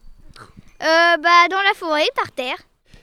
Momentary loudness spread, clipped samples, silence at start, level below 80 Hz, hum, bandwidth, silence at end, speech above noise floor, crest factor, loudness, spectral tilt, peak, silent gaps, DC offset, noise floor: 14 LU; under 0.1%; 0.05 s; -50 dBFS; none; 15 kHz; 0.45 s; 27 dB; 18 dB; -16 LUFS; -2 dB/octave; -2 dBFS; none; under 0.1%; -43 dBFS